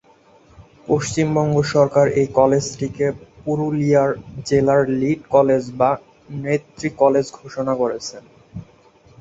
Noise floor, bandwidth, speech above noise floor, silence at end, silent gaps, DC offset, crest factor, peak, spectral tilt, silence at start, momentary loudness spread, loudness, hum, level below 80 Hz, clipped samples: -52 dBFS; 8 kHz; 34 dB; 0.55 s; none; under 0.1%; 18 dB; -2 dBFS; -6.5 dB/octave; 0.6 s; 14 LU; -19 LUFS; none; -50 dBFS; under 0.1%